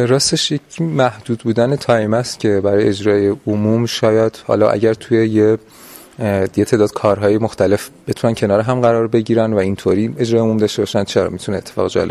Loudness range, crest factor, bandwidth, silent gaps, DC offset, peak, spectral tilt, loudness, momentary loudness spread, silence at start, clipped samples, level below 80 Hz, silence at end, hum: 1 LU; 16 dB; 14.5 kHz; none; under 0.1%; 0 dBFS; -5.5 dB/octave; -16 LUFS; 6 LU; 0 s; under 0.1%; -44 dBFS; 0 s; none